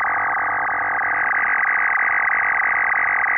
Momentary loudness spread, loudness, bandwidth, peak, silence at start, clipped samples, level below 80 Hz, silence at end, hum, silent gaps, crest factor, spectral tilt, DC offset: 3 LU; -18 LUFS; 3.3 kHz; -12 dBFS; 0 s; under 0.1%; -58 dBFS; 0 s; none; none; 8 dB; -7 dB/octave; under 0.1%